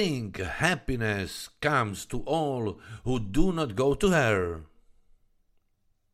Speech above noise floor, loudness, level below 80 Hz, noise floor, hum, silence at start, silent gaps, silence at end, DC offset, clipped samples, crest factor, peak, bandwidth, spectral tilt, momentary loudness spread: 43 dB; -28 LUFS; -40 dBFS; -70 dBFS; none; 0 s; none; 1.5 s; under 0.1%; under 0.1%; 20 dB; -8 dBFS; 15 kHz; -5.5 dB/octave; 11 LU